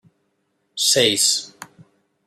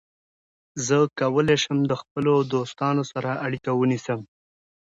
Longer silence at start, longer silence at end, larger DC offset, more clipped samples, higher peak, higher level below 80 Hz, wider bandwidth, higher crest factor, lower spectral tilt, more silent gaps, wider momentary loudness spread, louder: about the same, 0.75 s vs 0.75 s; about the same, 0.6 s vs 0.6 s; neither; neither; first, -4 dBFS vs -8 dBFS; second, -70 dBFS vs -62 dBFS; first, 16 kHz vs 8 kHz; about the same, 20 dB vs 16 dB; second, -1 dB/octave vs -5.5 dB/octave; second, none vs 2.11-2.15 s; first, 21 LU vs 8 LU; first, -16 LUFS vs -24 LUFS